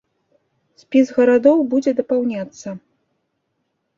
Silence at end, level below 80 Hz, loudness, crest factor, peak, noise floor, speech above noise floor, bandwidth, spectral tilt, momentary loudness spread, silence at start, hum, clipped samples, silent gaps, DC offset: 1.2 s; -64 dBFS; -17 LUFS; 18 dB; -2 dBFS; -72 dBFS; 55 dB; 7.6 kHz; -6 dB/octave; 19 LU; 0.9 s; none; under 0.1%; none; under 0.1%